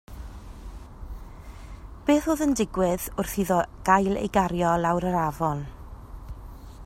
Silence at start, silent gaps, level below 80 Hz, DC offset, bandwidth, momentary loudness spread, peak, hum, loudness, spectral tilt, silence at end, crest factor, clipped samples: 0.1 s; none; -42 dBFS; under 0.1%; 16 kHz; 22 LU; -6 dBFS; none; -25 LUFS; -6 dB/octave; 0 s; 20 dB; under 0.1%